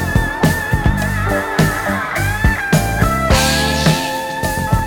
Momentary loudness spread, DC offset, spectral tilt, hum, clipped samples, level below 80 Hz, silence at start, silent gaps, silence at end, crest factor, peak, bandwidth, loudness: 5 LU; under 0.1%; -4.5 dB/octave; none; under 0.1%; -24 dBFS; 0 s; none; 0 s; 14 dB; 0 dBFS; 19 kHz; -16 LUFS